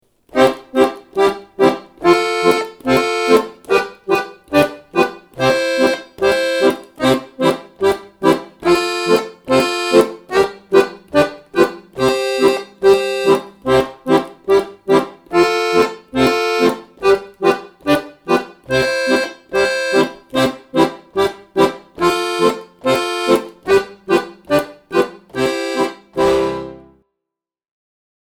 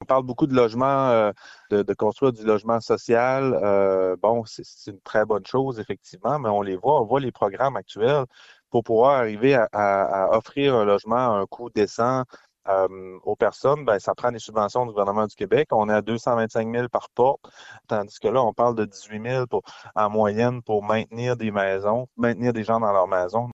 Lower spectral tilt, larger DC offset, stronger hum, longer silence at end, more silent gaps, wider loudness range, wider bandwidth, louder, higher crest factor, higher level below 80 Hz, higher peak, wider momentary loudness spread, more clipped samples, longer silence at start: second, -4.5 dB/octave vs -6.5 dB/octave; neither; neither; first, 1.5 s vs 0 s; neither; about the same, 2 LU vs 3 LU; first, 19 kHz vs 8 kHz; first, -16 LUFS vs -23 LUFS; about the same, 16 dB vs 16 dB; first, -48 dBFS vs -58 dBFS; first, 0 dBFS vs -6 dBFS; second, 5 LU vs 8 LU; neither; first, 0.35 s vs 0 s